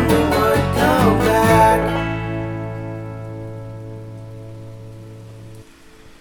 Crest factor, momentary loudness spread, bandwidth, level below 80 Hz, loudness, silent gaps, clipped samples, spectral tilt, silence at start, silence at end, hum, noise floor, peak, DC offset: 18 dB; 24 LU; over 20 kHz; -34 dBFS; -17 LUFS; none; under 0.1%; -6 dB/octave; 0 s; 0.05 s; none; -43 dBFS; 0 dBFS; under 0.1%